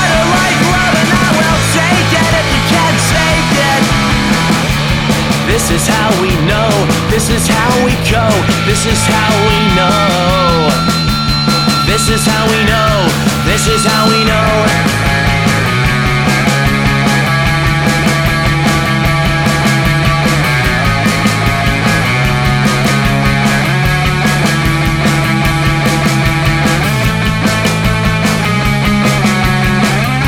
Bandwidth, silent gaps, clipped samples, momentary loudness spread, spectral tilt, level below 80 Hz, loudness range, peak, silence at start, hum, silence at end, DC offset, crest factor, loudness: 17.5 kHz; none; under 0.1%; 2 LU; -4.5 dB/octave; -24 dBFS; 1 LU; 0 dBFS; 0 s; none; 0 s; under 0.1%; 10 dB; -10 LUFS